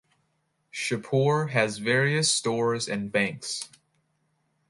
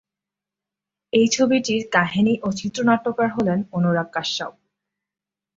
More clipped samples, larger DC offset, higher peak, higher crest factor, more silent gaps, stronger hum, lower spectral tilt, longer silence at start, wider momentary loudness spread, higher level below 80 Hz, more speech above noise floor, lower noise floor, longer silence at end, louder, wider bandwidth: neither; neither; second, -8 dBFS vs -2 dBFS; about the same, 20 dB vs 20 dB; neither; second, none vs 50 Hz at -45 dBFS; about the same, -4 dB/octave vs -5 dB/octave; second, 0.75 s vs 1.15 s; first, 10 LU vs 7 LU; second, -68 dBFS vs -60 dBFS; second, 48 dB vs 68 dB; second, -73 dBFS vs -88 dBFS; about the same, 1.05 s vs 1.05 s; second, -25 LUFS vs -21 LUFS; first, 11.5 kHz vs 7.8 kHz